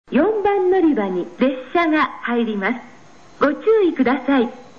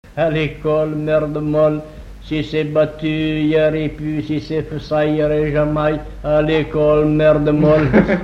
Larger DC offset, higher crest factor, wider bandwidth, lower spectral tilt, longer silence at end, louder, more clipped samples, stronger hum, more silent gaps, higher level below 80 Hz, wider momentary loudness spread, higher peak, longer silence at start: first, 0.5% vs under 0.1%; about the same, 14 dB vs 16 dB; about the same, 7 kHz vs 7.2 kHz; second, -7 dB/octave vs -8.5 dB/octave; first, 0.15 s vs 0 s; about the same, -18 LUFS vs -17 LUFS; neither; neither; neither; second, -56 dBFS vs -34 dBFS; second, 6 LU vs 10 LU; second, -4 dBFS vs 0 dBFS; about the same, 0.1 s vs 0.05 s